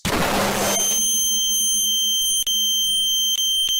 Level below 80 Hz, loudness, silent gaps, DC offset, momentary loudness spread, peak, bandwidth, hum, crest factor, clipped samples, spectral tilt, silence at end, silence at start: -44 dBFS; -17 LUFS; none; under 0.1%; 3 LU; -10 dBFS; 16.5 kHz; none; 10 dB; under 0.1%; -0.5 dB/octave; 0 s; 0.05 s